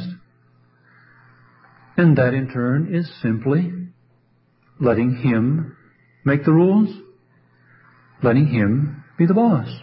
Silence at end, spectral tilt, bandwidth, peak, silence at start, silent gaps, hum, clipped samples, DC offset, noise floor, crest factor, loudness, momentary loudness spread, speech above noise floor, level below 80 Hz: 0.05 s; -13.5 dB/octave; 5.6 kHz; -4 dBFS; 0 s; none; none; under 0.1%; under 0.1%; -60 dBFS; 16 dB; -19 LUFS; 12 LU; 43 dB; -54 dBFS